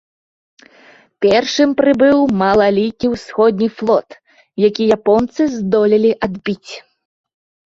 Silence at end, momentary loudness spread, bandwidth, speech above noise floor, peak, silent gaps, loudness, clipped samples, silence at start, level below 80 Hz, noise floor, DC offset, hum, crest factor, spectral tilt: 0.85 s; 10 LU; 7.6 kHz; 33 dB; 0 dBFS; none; -14 LUFS; under 0.1%; 1.2 s; -50 dBFS; -47 dBFS; under 0.1%; none; 14 dB; -6 dB/octave